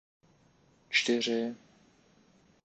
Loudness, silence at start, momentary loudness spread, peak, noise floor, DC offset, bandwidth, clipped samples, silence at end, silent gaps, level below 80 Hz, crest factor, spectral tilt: -30 LUFS; 0.9 s; 13 LU; -12 dBFS; -65 dBFS; under 0.1%; 8.8 kHz; under 0.1%; 1.1 s; none; -78 dBFS; 22 dB; -2.5 dB/octave